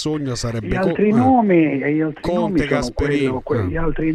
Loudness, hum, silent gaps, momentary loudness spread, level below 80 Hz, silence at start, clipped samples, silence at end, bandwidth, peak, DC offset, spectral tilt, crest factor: -18 LUFS; none; none; 8 LU; -32 dBFS; 0 s; under 0.1%; 0 s; 12 kHz; -4 dBFS; under 0.1%; -6.5 dB/octave; 14 dB